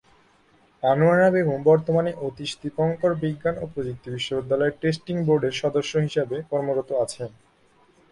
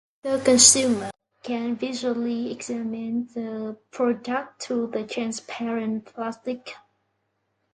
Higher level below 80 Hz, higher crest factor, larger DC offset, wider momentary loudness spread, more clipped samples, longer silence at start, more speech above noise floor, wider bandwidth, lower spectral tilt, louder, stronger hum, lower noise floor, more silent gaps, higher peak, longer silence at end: first, -56 dBFS vs -66 dBFS; second, 16 dB vs 26 dB; neither; second, 12 LU vs 17 LU; neither; first, 0.85 s vs 0.25 s; second, 36 dB vs 50 dB; about the same, 11.5 kHz vs 11.5 kHz; first, -6.5 dB/octave vs -2 dB/octave; about the same, -23 LUFS vs -23 LUFS; neither; second, -59 dBFS vs -74 dBFS; neither; second, -8 dBFS vs 0 dBFS; about the same, 0.85 s vs 0.95 s